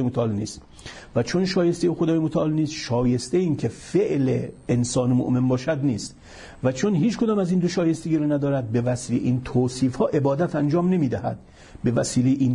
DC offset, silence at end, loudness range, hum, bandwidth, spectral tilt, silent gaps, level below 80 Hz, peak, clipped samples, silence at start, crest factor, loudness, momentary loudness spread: under 0.1%; 0 s; 1 LU; none; 11 kHz; -6.5 dB/octave; none; -50 dBFS; -10 dBFS; under 0.1%; 0 s; 12 dB; -23 LUFS; 7 LU